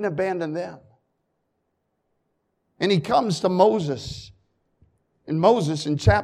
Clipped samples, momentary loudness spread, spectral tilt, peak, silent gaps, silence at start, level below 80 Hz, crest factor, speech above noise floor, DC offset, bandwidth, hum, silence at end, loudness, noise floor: under 0.1%; 13 LU; -6 dB/octave; -4 dBFS; none; 0 s; -44 dBFS; 20 dB; 53 dB; under 0.1%; 12.5 kHz; none; 0 s; -22 LUFS; -74 dBFS